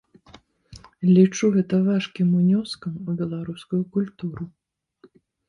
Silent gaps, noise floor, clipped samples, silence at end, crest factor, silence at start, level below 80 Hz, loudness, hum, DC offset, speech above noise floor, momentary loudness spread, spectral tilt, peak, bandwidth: none; -57 dBFS; under 0.1%; 1 s; 18 dB; 0.75 s; -60 dBFS; -22 LUFS; none; under 0.1%; 35 dB; 15 LU; -7 dB/octave; -6 dBFS; 10.5 kHz